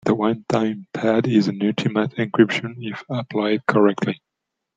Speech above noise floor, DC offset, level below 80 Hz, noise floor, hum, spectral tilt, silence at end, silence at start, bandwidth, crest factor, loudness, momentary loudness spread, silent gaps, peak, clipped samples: 61 dB; under 0.1%; -62 dBFS; -81 dBFS; none; -7 dB/octave; 0.6 s; 0.05 s; 7.8 kHz; 18 dB; -21 LUFS; 10 LU; none; -2 dBFS; under 0.1%